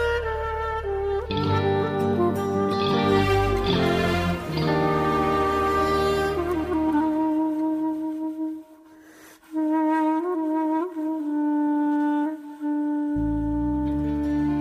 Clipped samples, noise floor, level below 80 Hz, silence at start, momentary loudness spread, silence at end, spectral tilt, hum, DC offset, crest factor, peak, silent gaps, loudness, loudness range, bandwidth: under 0.1%; -49 dBFS; -40 dBFS; 0 s; 6 LU; 0 s; -7 dB/octave; none; under 0.1%; 16 dB; -8 dBFS; none; -24 LUFS; 4 LU; 15.5 kHz